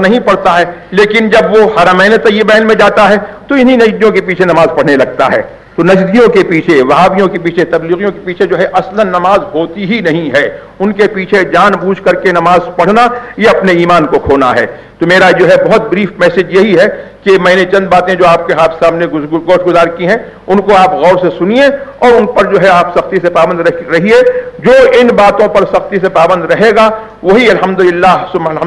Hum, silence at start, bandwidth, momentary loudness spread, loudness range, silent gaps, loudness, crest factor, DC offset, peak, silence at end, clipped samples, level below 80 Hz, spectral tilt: none; 0 s; 12 kHz; 7 LU; 3 LU; none; -7 LUFS; 8 dB; under 0.1%; 0 dBFS; 0 s; 2%; -38 dBFS; -6 dB/octave